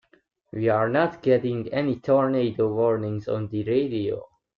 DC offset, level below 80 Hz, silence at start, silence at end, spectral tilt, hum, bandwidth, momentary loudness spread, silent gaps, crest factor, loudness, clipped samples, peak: under 0.1%; -62 dBFS; 0.55 s; 0.3 s; -9.5 dB/octave; none; 6.8 kHz; 7 LU; none; 16 dB; -24 LUFS; under 0.1%; -8 dBFS